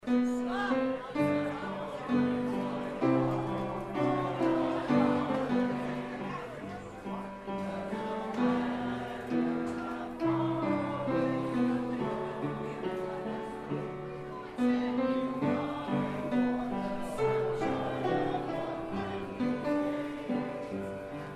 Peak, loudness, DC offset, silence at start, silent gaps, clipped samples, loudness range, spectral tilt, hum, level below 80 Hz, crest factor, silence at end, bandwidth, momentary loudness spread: -14 dBFS; -33 LUFS; under 0.1%; 0 s; none; under 0.1%; 4 LU; -7.5 dB/octave; none; -58 dBFS; 18 dB; 0 s; 12 kHz; 8 LU